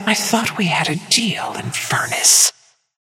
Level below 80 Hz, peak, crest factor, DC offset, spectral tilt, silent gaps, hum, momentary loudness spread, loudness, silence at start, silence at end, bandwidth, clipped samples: -64 dBFS; 0 dBFS; 18 dB; under 0.1%; -1.5 dB/octave; none; none; 12 LU; -15 LUFS; 0 s; 0.5 s; 17 kHz; under 0.1%